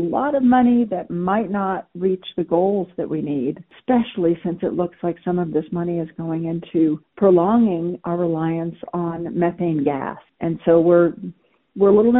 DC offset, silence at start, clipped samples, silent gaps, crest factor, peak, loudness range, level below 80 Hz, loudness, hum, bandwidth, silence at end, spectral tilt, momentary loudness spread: under 0.1%; 0 s; under 0.1%; none; 16 dB; -4 dBFS; 3 LU; -56 dBFS; -20 LUFS; none; 4 kHz; 0 s; -7.5 dB/octave; 11 LU